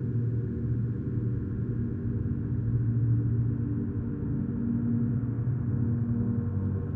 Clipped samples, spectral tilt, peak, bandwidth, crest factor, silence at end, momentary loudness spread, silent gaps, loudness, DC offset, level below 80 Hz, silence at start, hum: under 0.1%; -13.5 dB/octave; -16 dBFS; 2 kHz; 12 dB; 0 s; 4 LU; none; -30 LUFS; under 0.1%; -42 dBFS; 0 s; none